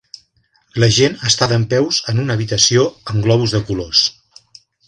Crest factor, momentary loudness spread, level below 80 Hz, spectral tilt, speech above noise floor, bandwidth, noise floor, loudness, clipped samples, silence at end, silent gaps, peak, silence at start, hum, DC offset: 16 dB; 7 LU; -44 dBFS; -4 dB/octave; 44 dB; 10.5 kHz; -59 dBFS; -15 LUFS; under 0.1%; 0.75 s; none; 0 dBFS; 0.75 s; none; under 0.1%